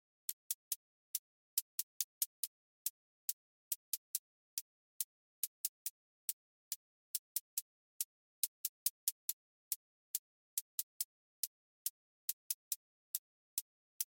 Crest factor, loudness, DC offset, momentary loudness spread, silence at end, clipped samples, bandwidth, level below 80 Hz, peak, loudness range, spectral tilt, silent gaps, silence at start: 28 dB; -43 LUFS; under 0.1%; 6 LU; 0.05 s; under 0.1%; 17 kHz; under -90 dBFS; -18 dBFS; 2 LU; 9 dB/octave; 0.33-14.00 s; 0.3 s